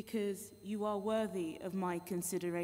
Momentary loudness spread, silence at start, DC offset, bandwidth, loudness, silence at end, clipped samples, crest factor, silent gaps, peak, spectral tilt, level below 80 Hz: 5 LU; 0 s; under 0.1%; 16 kHz; -39 LUFS; 0 s; under 0.1%; 14 dB; none; -24 dBFS; -5.5 dB/octave; -74 dBFS